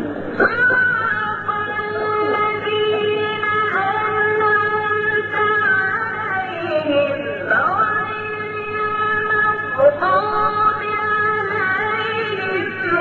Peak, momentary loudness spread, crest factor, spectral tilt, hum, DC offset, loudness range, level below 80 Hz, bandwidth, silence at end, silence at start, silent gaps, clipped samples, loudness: -2 dBFS; 6 LU; 16 dB; -6.5 dB/octave; none; under 0.1%; 2 LU; -54 dBFS; 7 kHz; 0 s; 0 s; none; under 0.1%; -18 LUFS